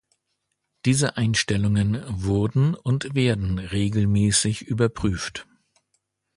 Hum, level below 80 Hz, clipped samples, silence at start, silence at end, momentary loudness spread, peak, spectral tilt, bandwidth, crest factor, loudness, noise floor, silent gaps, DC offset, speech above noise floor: none; -42 dBFS; under 0.1%; 0.85 s; 0.95 s; 6 LU; -6 dBFS; -5 dB/octave; 11.5 kHz; 16 dB; -23 LUFS; -77 dBFS; none; under 0.1%; 55 dB